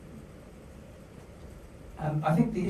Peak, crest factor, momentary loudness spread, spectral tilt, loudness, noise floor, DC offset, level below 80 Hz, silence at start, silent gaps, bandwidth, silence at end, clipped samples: -12 dBFS; 22 dB; 23 LU; -8.5 dB/octave; -29 LUFS; -48 dBFS; under 0.1%; -52 dBFS; 0 s; none; 13.5 kHz; 0 s; under 0.1%